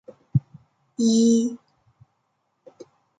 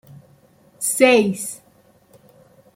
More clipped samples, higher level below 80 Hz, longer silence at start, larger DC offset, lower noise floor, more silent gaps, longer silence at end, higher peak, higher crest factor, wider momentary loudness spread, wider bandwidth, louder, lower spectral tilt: neither; first, -60 dBFS vs -66 dBFS; second, 0.35 s vs 0.8 s; neither; first, -73 dBFS vs -55 dBFS; neither; first, 1.65 s vs 1.2 s; second, -8 dBFS vs -2 dBFS; about the same, 16 dB vs 20 dB; first, 19 LU vs 16 LU; second, 9.4 kHz vs 16.5 kHz; second, -22 LUFS vs -18 LUFS; first, -6.5 dB/octave vs -3.5 dB/octave